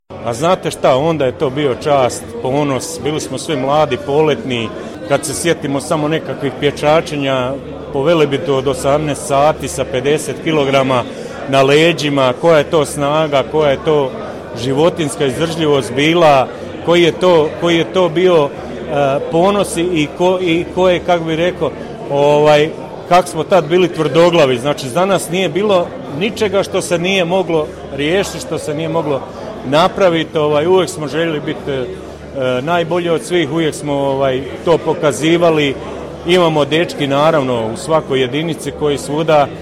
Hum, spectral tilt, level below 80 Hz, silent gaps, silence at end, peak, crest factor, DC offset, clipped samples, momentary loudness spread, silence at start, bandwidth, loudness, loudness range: none; -5 dB/octave; -42 dBFS; none; 0 s; -2 dBFS; 14 dB; under 0.1%; under 0.1%; 9 LU; 0.1 s; 15.5 kHz; -14 LUFS; 4 LU